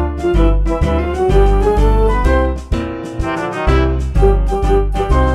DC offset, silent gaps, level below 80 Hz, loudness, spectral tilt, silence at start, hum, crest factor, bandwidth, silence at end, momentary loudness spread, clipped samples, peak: under 0.1%; none; -16 dBFS; -15 LUFS; -7.5 dB/octave; 0 s; none; 12 dB; 10 kHz; 0 s; 7 LU; under 0.1%; 0 dBFS